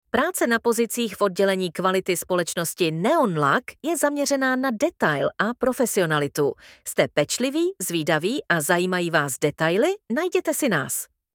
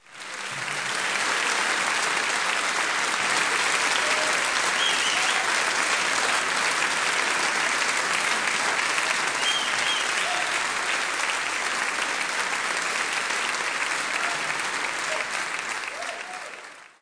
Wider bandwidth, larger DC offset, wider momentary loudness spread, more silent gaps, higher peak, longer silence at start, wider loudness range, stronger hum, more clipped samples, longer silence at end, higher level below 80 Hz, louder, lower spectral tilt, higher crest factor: first, 18.5 kHz vs 10.5 kHz; neither; second, 4 LU vs 7 LU; neither; first, -2 dBFS vs -8 dBFS; about the same, 0.15 s vs 0.1 s; second, 1 LU vs 4 LU; neither; neither; first, 0.3 s vs 0.15 s; first, -62 dBFS vs -68 dBFS; about the same, -23 LUFS vs -23 LUFS; first, -4 dB/octave vs 0.5 dB/octave; about the same, 20 dB vs 18 dB